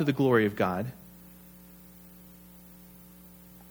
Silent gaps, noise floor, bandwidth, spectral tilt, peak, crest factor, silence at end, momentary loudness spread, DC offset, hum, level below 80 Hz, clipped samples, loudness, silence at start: none; -52 dBFS; over 20 kHz; -7 dB/octave; -10 dBFS; 20 dB; 0.1 s; 26 LU; under 0.1%; none; -62 dBFS; under 0.1%; -27 LUFS; 0 s